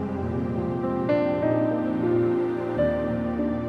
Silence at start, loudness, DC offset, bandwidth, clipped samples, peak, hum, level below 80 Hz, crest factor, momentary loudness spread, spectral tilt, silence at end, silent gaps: 0 s; -25 LUFS; under 0.1%; 5.8 kHz; under 0.1%; -10 dBFS; none; -46 dBFS; 14 dB; 4 LU; -9.5 dB/octave; 0 s; none